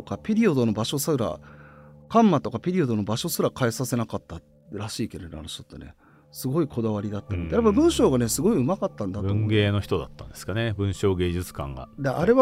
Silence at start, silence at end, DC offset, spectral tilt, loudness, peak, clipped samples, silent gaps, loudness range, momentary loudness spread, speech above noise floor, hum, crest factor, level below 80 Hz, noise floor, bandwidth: 0 s; 0 s; under 0.1%; -6 dB/octave; -25 LUFS; -6 dBFS; under 0.1%; none; 8 LU; 16 LU; 24 dB; none; 20 dB; -46 dBFS; -48 dBFS; 16 kHz